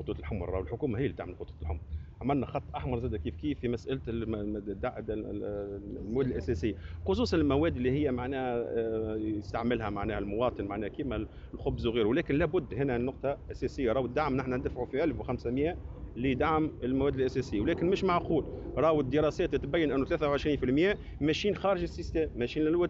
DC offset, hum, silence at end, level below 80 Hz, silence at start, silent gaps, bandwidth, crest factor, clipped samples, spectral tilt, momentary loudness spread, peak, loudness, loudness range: under 0.1%; none; 0 s; -44 dBFS; 0 s; none; 7.8 kHz; 16 dB; under 0.1%; -6 dB/octave; 9 LU; -16 dBFS; -32 LUFS; 6 LU